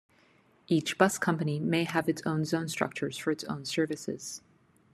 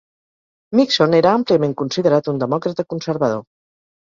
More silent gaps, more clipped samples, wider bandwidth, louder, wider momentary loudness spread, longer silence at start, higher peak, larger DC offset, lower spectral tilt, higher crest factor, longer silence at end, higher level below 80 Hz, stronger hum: neither; neither; first, 13.5 kHz vs 7.6 kHz; second, -30 LUFS vs -17 LUFS; about the same, 10 LU vs 10 LU; about the same, 0.7 s vs 0.7 s; second, -6 dBFS vs -2 dBFS; neither; about the same, -5 dB/octave vs -6 dB/octave; first, 24 dB vs 16 dB; second, 0.55 s vs 0.7 s; second, -70 dBFS vs -60 dBFS; neither